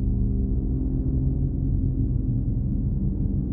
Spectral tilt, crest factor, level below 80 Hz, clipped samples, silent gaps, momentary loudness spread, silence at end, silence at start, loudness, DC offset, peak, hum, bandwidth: -16 dB/octave; 12 dB; -26 dBFS; under 0.1%; none; 1 LU; 0 s; 0 s; -26 LUFS; under 0.1%; -12 dBFS; none; 1.3 kHz